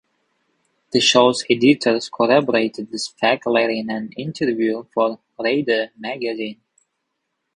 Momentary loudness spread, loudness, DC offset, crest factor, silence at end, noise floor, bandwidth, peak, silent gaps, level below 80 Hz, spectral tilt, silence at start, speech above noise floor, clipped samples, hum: 12 LU; -19 LUFS; under 0.1%; 20 dB; 1.05 s; -75 dBFS; 11 kHz; 0 dBFS; none; -64 dBFS; -4 dB/octave; 0.9 s; 57 dB; under 0.1%; none